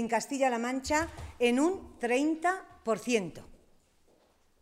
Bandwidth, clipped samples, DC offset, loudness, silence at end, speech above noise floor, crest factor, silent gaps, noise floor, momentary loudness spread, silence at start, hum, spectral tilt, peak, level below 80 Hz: 16 kHz; under 0.1%; under 0.1%; -30 LUFS; 1.05 s; 36 dB; 18 dB; none; -66 dBFS; 8 LU; 0 s; none; -4 dB/octave; -14 dBFS; -56 dBFS